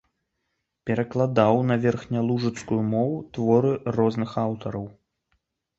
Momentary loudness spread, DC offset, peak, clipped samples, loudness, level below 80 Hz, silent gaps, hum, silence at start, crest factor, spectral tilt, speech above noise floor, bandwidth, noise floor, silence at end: 10 LU; under 0.1%; -4 dBFS; under 0.1%; -24 LUFS; -58 dBFS; none; none; 0.85 s; 20 dB; -8 dB/octave; 55 dB; 8 kHz; -78 dBFS; 0.9 s